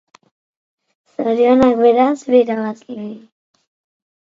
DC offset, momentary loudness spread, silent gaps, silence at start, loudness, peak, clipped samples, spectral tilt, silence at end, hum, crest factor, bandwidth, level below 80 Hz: under 0.1%; 18 LU; none; 1.2 s; -14 LUFS; 0 dBFS; under 0.1%; -6.5 dB/octave; 1.05 s; none; 16 dB; 7.6 kHz; -54 dBFS